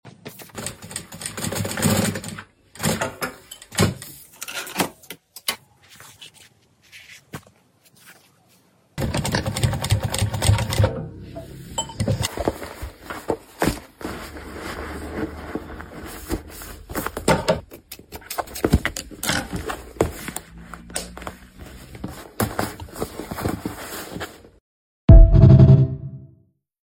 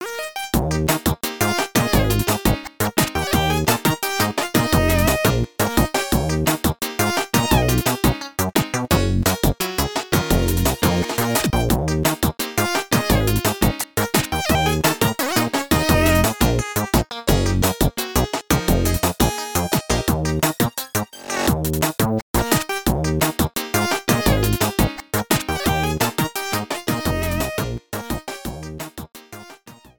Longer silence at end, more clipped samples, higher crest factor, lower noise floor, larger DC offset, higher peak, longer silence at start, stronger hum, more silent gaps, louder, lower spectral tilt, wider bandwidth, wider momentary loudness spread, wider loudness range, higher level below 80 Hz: first, 0.65 s vs 0.25 s; neither; about the same, 22 dB vs 18 dB; first, -58 dBFS vs -44 dBFS; neither; about the same, 0 dBFS vs -2 dBFS; about the same, 0.05 s vs 0 s; neither; first, 24.60-25.08 s vs 22.22-22.34 s; about the same, -22 LUFS vs -20 LUFS; about the same, -5.5 dB/octave vs -4.5 dB/octave; second, 17 kHz vs 19.5 kHz; first, 19 LU vs 6 LU; first, 14 LU vs 2 LU; about the same, -28 dBFS vs -30 dBFS